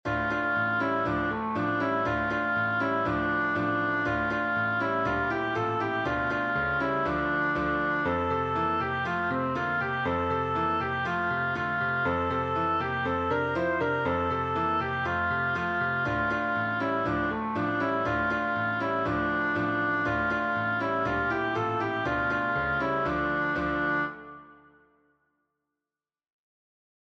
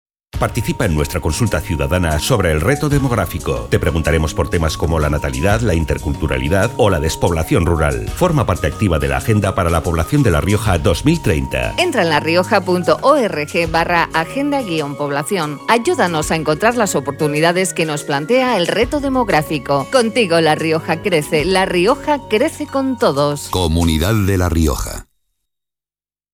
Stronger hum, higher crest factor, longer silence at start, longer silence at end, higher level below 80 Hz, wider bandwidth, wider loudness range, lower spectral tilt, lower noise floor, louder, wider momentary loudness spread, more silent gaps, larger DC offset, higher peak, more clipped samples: neither; about the same, 12 dB vs 16 dB; second, 0.05 s vs 0.35 s; first, 2.5 s vs 1.3 s; second, -50 dBFS vs -28 dBFS; second, 8 kHz vs 18.5 kHz; about the same, 1 LU vs 2 LU; first, -7 dB/octave vs -5.5 dB/octave; about the same, under -90 dBFS vs under -90 dBFS; second, -27 LUFS vs -16 LUFS; second, 2 LU vs 5 LU; neither; neither; second, -16 dBFS vs 0 dBFS; neither